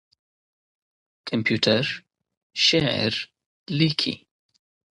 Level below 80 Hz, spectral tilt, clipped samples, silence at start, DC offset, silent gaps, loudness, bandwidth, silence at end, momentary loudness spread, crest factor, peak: -60 dBFS; -4.5 dB/octave; under 0.1%; 1.25 s; under 0.1%; 2.37-2.50 s, 3.46-3.66 s; -22 LUFS; 11.5 kHz; 0.8 s; 17 LU; 22 dB; -4 dBFS